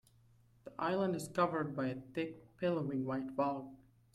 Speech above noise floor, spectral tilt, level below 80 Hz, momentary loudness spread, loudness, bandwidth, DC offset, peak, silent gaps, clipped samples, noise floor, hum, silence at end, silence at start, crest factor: 30 dB; -6.5 dB/octave; -72 dBFS; 10 LU; -38 LUFS; 14 kHz; under 0.1%; -20 dBFS; none; under 0.1%; -67 dBFS; none; 0.4 s; 0.65 s; 20 dB